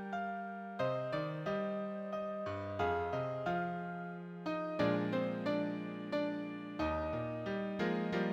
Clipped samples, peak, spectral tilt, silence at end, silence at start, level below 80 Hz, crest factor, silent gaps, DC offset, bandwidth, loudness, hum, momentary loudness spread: under 0.1%; -22 dBFS; -7.5 dB/octave; 0 s; 0 s; -60 dBFS; 16 dB; none; under 0.1%; 8.6 kHz; -38 LUFS; none; 7 LU